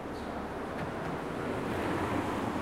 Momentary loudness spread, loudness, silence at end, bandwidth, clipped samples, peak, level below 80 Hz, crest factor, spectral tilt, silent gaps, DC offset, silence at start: 6 LU; -35 LUFS; 0 s; 16.5 kHz; under 0.1%; -18 dBFS; -52 dBFS; 16 dB; -6 dB/octave; none; under 0.1%; 0 s